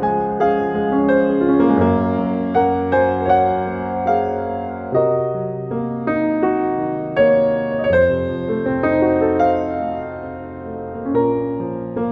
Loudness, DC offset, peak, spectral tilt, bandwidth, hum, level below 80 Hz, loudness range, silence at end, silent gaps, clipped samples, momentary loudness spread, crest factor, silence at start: -18 LUFS; under 0.1%; -4 dBFS; -9.5 dB/octave; 5.8 kHz; none; -46 dBFS; 4 LU; 0 s; none; under 0.1%; 10 LU; 14 dB; 0 s